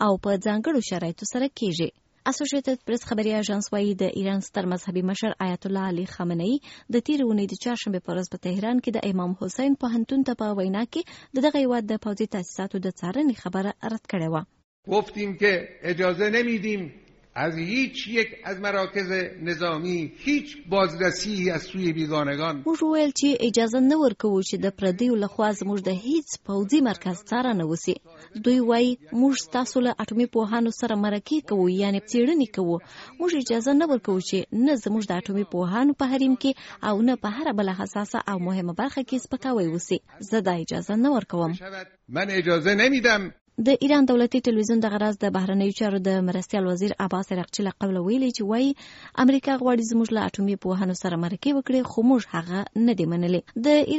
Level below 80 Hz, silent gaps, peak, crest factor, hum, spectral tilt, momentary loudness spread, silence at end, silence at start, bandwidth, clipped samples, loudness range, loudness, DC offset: -60 dBFS; 14.64-14.83 s, 43.41-43.45 s; -6 dBFS; 18 dB; none; -5 dB/octave; 8 LU; 0 s; 0 s; 8 kHz; under 0.1%; 4 LU; -25 LUFS; under 0.1%